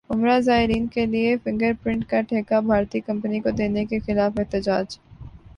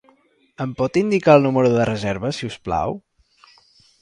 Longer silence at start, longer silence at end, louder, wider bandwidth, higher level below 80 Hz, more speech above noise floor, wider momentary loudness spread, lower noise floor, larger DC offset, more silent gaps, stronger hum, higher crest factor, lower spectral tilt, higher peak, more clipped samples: second, 0.1 s vs 0.6 s; second, 0.05 s vs 1.05 s; second, -22 LUFS vs -19 LUFS; about the same, 9.8 kHz vs 10.5 kHz; about the same, -44 dBFS vs -48 dBFS; second, 20 dB vs 39 dB; second, 7 LU vs 15 LU; second, -42 dBFS vs -58 dBFS; neither; neither; neither; about the same, 16 dB vs 20 dB; about the same, -7 dB/octave vs -7 dB/octave; second, -6 dBFS vs -2 dBFS; neither